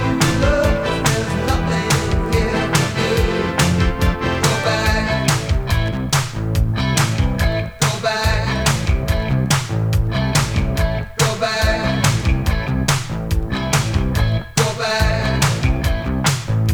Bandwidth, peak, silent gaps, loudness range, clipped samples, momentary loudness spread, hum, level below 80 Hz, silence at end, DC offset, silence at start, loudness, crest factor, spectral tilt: over 20 kHz; -2 dBFS; none; 1 LU; under 0.1%; 3 LU; none; -24 dBFS; 0 s; under 0.1%; 0 s; -18 LUFS; 16 dB; -4.5 dB/octave